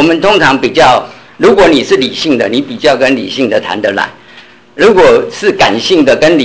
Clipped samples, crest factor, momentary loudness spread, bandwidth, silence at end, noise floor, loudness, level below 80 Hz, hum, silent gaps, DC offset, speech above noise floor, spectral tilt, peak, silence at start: under 0.1%; 8 dB; 7 LU; 8 kHz; 0 s; -37 dBFS; -8 LUFS; -40 dBFS; none; none; under 0.1%; 29 dB; -4.5 dB/octave; 0 dBFS; 0 s